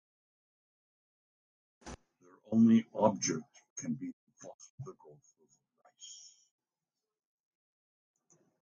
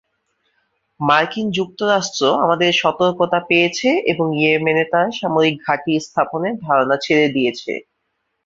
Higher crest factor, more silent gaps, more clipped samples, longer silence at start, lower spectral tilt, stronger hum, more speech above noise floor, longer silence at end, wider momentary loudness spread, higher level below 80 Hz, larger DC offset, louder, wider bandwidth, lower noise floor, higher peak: first, 24 dB vs 16 dB; first, 3.70-3.76 s, 4.13-4.27 s, 4.54-4.59 s, 4.70-4.78 s vs none; neither; first, 1.85 s vs 1 s; about the same, -5.5 dB/octave vs -4.5 dB/octave; neither; first, over 59 dB vs 55 dB; first, 2.45 s vs 0.65 s; first, 27 LU vs 6 LU; second, -72 dBFS vs -60 dBFS; neither; second, -31 LUFS vs -17 LUFS; about the same, 7.6 kHz vs 7.8 kHz; first, under -90 dBFS vs -72 dBFS; second, -14 dBFS vs -2 dBFS